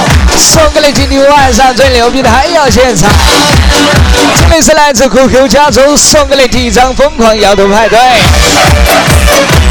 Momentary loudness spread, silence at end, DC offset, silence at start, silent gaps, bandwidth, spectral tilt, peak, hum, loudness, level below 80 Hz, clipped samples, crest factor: 3 LU; 0 s; under 0.1%; 0 s; none; over 20 kHz; -3.5 dB/octave; 0 dBFS; none; -4 LUFS; -12 dBFS; 2%; 4 dB